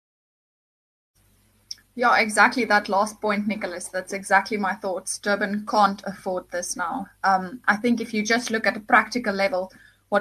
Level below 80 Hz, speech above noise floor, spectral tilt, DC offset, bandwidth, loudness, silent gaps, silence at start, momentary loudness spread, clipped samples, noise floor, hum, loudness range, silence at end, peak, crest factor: -64 dBFS; 38 dB; -3.5 dB/octave; under 0.1%; 13 kHz; -23 LUFS; none; 1.7 s; 11 LU; under 0.1%; -61 dBFS; none; 3 LU; 0 s; -2 dBFS; 22 dB